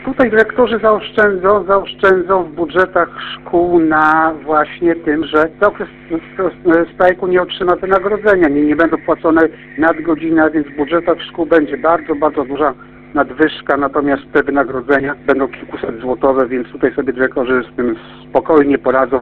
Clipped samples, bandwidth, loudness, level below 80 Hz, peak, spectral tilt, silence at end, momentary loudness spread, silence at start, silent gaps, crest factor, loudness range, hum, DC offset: under 0.1%; 4.6 kHz; -14 LUFS; -42 dBFS; 0 dBFS; -7.5 dB/octave; 0 s; 7 LU; 0 s; none; 14 dB; 3 LU; none; under 0.1%